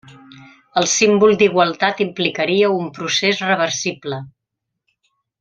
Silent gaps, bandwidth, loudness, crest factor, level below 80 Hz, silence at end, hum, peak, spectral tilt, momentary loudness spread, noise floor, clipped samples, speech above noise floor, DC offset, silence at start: none; 9.2 kHz; -16 LUFS; 18 dB; -62 dBFS; 1.15 s; none; 0 dBFS; -3 dB/octave; 11 LU; -79 dBFS; under 0.1%; 63 dB; under 0.1%; 0.05 s